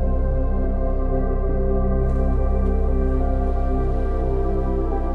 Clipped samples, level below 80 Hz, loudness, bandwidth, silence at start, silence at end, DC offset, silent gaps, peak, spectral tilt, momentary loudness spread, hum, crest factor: under 0.1%; -20 dBFS; -23 LUFS; 2.5 kHz; 0 s; 0 s; under 0.1%; none; -8 dBFS; -11 dB/octave; 2 LU; none; 10 dB